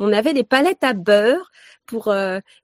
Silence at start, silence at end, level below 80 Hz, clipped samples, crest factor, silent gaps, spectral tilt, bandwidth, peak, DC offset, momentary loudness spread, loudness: 0 s; 0.2 s; -68 dBFS; under 0.1%; 18 dB; none; -5 dB/octave; 16 kHz; 0 dBFS; under 0.1%; 10 LU; -18 LUFS